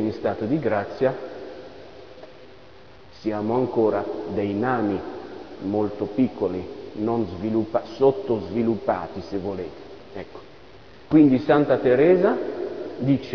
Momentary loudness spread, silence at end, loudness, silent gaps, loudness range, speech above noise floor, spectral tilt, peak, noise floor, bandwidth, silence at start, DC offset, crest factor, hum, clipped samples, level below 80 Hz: 21 LU; 0 s; -23 LUFS; none; 7 LU; 26 dB; -9 dB/octave; -6 dBFS; -48 dBFS; 5.4 kHz; 0 s; 0.4%; 18 dB; none; under 0.1%; -56 dBFS